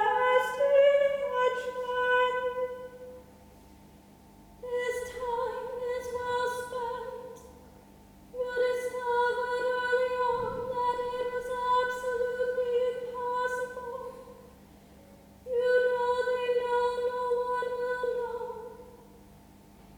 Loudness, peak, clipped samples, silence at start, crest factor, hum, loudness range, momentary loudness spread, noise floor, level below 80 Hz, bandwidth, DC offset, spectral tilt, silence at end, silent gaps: -29 LUFS; -12 dBFS; under 0.1%; 0 s; 18 dB; 50 Hz at -60 dBFS; 6 LU; 15 LU; -55 dBFS; -60 dBFS; 19 kHz; under 0.1%; -3.5 dB/octave; 0 s; none